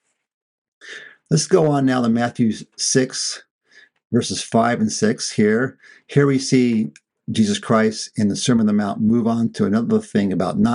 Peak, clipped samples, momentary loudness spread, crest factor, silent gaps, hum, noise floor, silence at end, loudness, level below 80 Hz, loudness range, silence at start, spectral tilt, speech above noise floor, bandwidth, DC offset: -2 dBFS; under 0.1%; 8 LU; 16 dB; 3.51-3.59 s, 4.05-4.10 s; none; -39 dBFS; 0 s; -19 LUFS; -58 dBFS; 2 LU; 0.85 s; -5 dB/octave; 21 dB; 11 kHz; under 0.1%